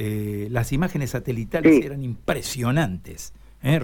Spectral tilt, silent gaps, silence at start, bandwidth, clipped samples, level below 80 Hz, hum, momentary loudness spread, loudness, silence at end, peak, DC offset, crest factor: -6.5 dB/octave; none; 0 s; 18 kHz; under 0.1%; -42 dBFS; none; 16 LU; -23 LUFS; 0 s; -6 dBFS; under 0.1%; 16 dB